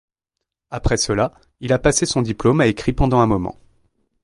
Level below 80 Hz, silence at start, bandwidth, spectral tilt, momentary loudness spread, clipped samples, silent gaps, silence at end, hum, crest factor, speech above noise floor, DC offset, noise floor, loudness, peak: -32 dBFS; 0.7 s; 11.5 kHz; -5 dB/octave; 10 LU; under 0.1%; none; 0.7 s; none; 18 dB; 63 dB; under 0.1%; -81 dBFS; -18 LUFS; -2 dBFS